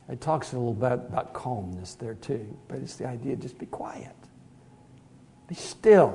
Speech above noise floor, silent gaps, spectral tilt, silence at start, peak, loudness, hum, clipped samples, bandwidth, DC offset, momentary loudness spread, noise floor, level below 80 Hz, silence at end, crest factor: 27 dB; none; -6.5 dB/octave; 0.1 s; -6 dBFS; -29 LUFS; none; under 0.1%; 11 kHz; under 0.1%; 13 LU; -54 dBFS; -62 dBFS; 0 s; 22 dB